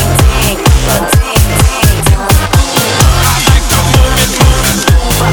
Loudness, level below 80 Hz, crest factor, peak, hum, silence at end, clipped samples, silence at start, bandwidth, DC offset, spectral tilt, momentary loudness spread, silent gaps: -8 LUFS; -12 dBFS; 8 dB; 0 dBFS; none; 0 s; 1%; 0 s; over 20 kHz; under 0.1%; -4 dB/octave; 2 LU; none